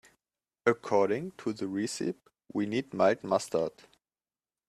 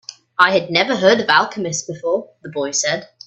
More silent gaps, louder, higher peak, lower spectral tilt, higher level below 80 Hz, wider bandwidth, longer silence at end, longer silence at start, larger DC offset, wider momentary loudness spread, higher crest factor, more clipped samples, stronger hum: neither; second, -31 LUFS vs -17 LUFS; second, -10 dBFS vs 0 dBFS; first, -5 dB/octave vs -2.5 dB/octave; second, -72 dBFS vs -62 dBFS; first, 13.5 kHz vs 8.6 kHz; first, 1 s vs 0.2 s; first, 0.65 s vs 0.1 s; neither; about the same, 9 LU vs 10 LU; about the same, 22 dB vs 18 dB; neither; neither